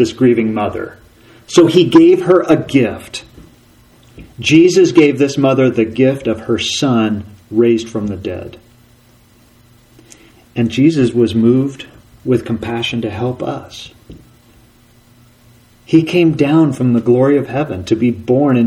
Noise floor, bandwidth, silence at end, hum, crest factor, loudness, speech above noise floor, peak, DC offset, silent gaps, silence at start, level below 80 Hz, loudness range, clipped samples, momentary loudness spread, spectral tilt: -48 dBFS; 12 kHz; 0 s; none; 14 dB; -13 LUFS; 35 dB; 0 dBFS; under 0.1%; none; 0 s; -48 dBFS; 9 LU; under 0.1%; 17 LU; -6 dB/octave